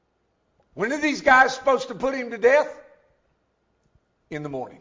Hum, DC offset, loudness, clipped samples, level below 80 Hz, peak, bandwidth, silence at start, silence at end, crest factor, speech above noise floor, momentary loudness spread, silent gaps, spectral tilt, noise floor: none; under 0.1%; -21 LUFS; under 0.1%; -58 dBFS; -4 dBFS; 7.6 kHz; 0.75 s; 0.05 s; 20 dB; 49 dB; 17 LU; none; -4 dB/octave; -70 dBFS